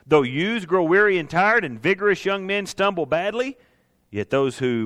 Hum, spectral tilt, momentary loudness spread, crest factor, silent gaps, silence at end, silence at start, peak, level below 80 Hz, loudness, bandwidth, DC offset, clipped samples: none; -5.5 dB/octave; 8 LU; 18 dB; none; 0 s; 0.1 s; -4 dBFS; -58 dBFS; -21 LUFS; 12.5 kHz; under 0.1%; under 0.1%